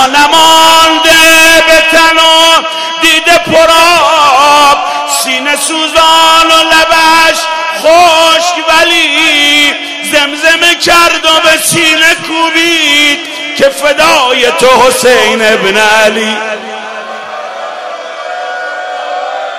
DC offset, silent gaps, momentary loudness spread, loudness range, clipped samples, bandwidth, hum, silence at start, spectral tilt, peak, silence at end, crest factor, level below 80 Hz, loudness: 0.9%; none; 14 LU; 5 LU; 4%; over 20 kHz; none; 0 s; -1 dB/octave; 0 dBFS; 0 s; 6 dB; -40 dBFS; -5 LUFS